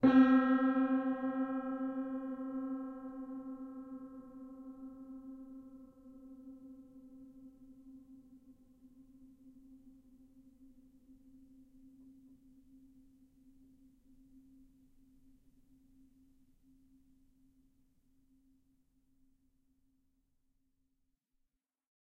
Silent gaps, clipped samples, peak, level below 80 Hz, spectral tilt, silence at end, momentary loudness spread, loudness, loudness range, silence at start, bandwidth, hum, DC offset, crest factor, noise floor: none; under 0.1%; -16 dBFS; -72 dBFS; -8 dB/octave; 12.15 s; 27 LU; -35 LUFS; 26 LU; 0 s; 4.5 kHz; none; under 0.1%; 24 dB; -84 dBFS